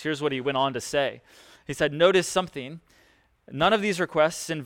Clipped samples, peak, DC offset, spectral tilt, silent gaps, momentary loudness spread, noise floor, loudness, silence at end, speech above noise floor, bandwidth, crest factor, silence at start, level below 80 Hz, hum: under 0.1%; -6 dBFS; under 0.1%; -4 dB/octave; none; 17 LU; -62 dBFS; -24 LUFS; 0 s; 36 dB; 17 kHz; 20 dB; 0 s; -58 dBFS; none